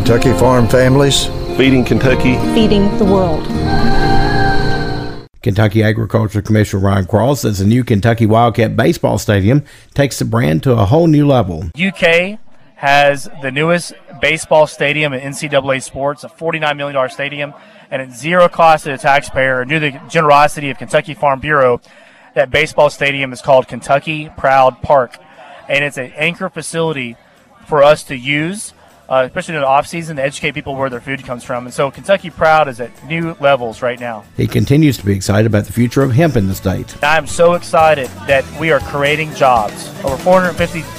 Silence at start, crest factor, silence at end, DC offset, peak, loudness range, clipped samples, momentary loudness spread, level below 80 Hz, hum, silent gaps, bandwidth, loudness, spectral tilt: 0 s; 14 dB; 0 s; under 0.1%; 0 dBFS; 4 LU; under 0.1%; 10 LU; -30 dBFS; none; none; 16 kHz; -14 LUFS; -5.5 dB/octave